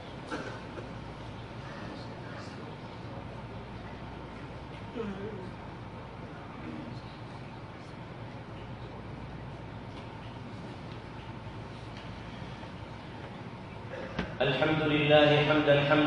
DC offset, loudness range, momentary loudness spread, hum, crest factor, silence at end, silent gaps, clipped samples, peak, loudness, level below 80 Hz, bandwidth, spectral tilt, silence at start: under 0.1%; 14 LU; 19 LU; none; 24 dB; 0 s; none; under 0.1%; -10 dBFS; -34 LUFS; -54 dBFS; 10.5 kHz; -7 dB/octave; 0 s